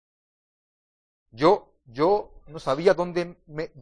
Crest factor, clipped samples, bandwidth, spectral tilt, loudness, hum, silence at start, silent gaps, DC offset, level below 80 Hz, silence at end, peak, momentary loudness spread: 20 dB; under 0.1%; 10 kHz; -6.5 dB/octave; -24 LUFS; none; 1.35 s; none; under 0.1%; -54 dBFS; 0 s; -6 dBFS; 14 LU